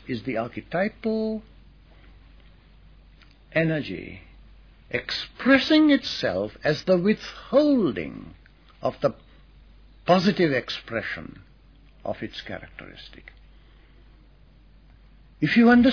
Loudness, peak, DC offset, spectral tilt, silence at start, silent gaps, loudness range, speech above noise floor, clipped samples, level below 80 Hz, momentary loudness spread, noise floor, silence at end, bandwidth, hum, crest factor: -24 LUFS; -6 dBFS; under 0.1%; -6.5 dB/octave; 0.05 s; none; 16 LU; 30 dB; under 0.1%; -52 dBFS; 20 LU; -53 dBFS; 0 s; 5.4 kHz; none; 20 dB